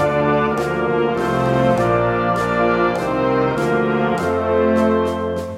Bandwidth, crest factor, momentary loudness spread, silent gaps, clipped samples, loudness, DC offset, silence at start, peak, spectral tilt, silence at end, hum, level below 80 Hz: 15.5 kHz; 14 dB; 3 LU; none; under 0.1%; -18 LUFS; under 0.1%; 0 s; -4 dBFS; -7 dB/octave; 0 s; none; -42 dBFS